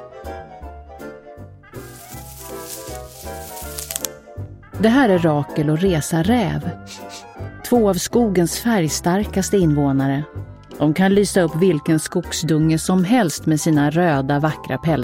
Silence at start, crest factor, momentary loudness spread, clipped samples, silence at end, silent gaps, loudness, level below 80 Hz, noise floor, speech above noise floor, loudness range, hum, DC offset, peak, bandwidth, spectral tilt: 0 s; 20 dB; 19 LU; under 0.1%; 0 s; none; -18 LUFS; -40 dBFS; -39 dBFS; 22 dB; 13 LU; none; under 0.1%; 0 dBFS; 17 kHz; -5.5 dB/octave